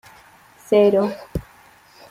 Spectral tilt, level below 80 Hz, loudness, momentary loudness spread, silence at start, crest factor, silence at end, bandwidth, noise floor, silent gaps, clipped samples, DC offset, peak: -7 dB/octave; -44 dBFS; -18 LUFS; 17 LU; 0.7 s; 18 dB; 0.7 s; 15 kHz; -50 dBFS; none; under 0.1%; under 0.1%; -4 dBFS